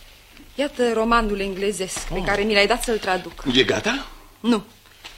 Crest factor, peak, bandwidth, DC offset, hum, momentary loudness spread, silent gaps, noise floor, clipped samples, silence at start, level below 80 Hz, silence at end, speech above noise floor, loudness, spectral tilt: 22 dB; 0 dBFS; 16.5 kHz; under 0.1%; none; 10 LU; none; -46 dBFS; under 0.1%; 0 s; -38 dBFS; 0 s; 25 dB; -21 LUFS; -3.5 dB/octave